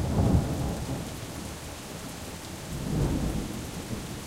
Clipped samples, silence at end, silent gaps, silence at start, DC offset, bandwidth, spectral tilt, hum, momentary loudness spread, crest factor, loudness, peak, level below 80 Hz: under 0.1%; 0 s; none; 0 s; under 0.1%; 16 kHz; -6 dB/octave; none; 13 LU; 20 dB; -32 LUFS; -12 dBFS; -38 dBFS